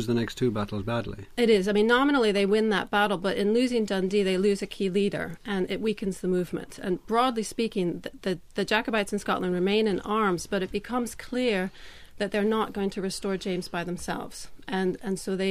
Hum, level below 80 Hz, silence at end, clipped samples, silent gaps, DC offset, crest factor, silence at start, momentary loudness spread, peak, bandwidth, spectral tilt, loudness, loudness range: none; -50 dBFS; 0 s; under 0.1%; none; under 0.1%; 16 dB; 0 s; 10 LU; -10 dBFS; 15.5 kHz; -5.5 dB/octave; -27 LUFS; 6 LU